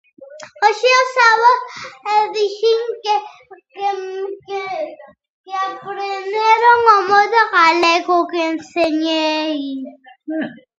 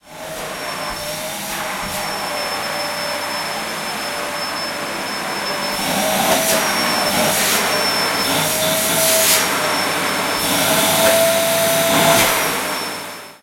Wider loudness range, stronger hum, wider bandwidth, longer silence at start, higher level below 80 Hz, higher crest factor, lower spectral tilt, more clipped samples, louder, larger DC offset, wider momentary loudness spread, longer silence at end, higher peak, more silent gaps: about the same, 10 LU vs 8 LU; neither; second, 8.2 kHz vs 16.5 kHz; first, 0.2 s vs 0.05 s; second, -66 dBFS vs -50 dBFS; about the same, 16 dB vs 18 dB; about the same, -2 dB/octave vs -1.5 dB/octave; neither; about the same, -16 LUFS vs -17 LUFS; neither; first, 16 LU vs 11 LU; first, 0.25 s vs 0.05 s; about the same, 0 dBFS vs -2 dBFS; first, 5.29-5.44 s vs none